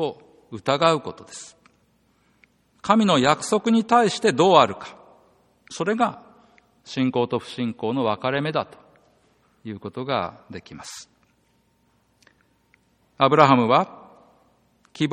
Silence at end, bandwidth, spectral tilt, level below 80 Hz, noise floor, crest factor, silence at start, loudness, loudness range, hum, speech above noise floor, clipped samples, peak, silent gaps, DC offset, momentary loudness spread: 0 s; 12 kHz; -5 dB/octave; -64 dBFS; -65 dBFS; 24 dB; 0 s; -21 LUFS; 14 LU; none; 44 dB; under 0.1%; 0 dBFS; none; under 0.1%; 23 LU